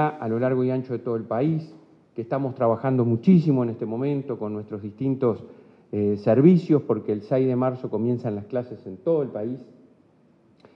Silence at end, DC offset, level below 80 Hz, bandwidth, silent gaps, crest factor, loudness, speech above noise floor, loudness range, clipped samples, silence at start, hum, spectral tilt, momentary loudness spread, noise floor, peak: 1.15 s; under 0.1%; -70 dBFS; 5.8 kHz; none; 20 dB; -24 LUFS; 36 dB; 4 LU; under 0.1%; 0 s; none; -11 dB/octave; 14 LU; -58 dBFS; -4 dBFS